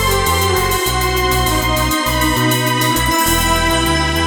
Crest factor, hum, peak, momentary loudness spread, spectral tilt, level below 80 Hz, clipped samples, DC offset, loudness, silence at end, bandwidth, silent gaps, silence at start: 14 dB; none; 0 dBFS; 2 LU; -3.5 dB/octave; -24 dBFS; under 0.1%; under 0.1%; -14 LUFS; 0 s; over 20 kHz; none; 0 s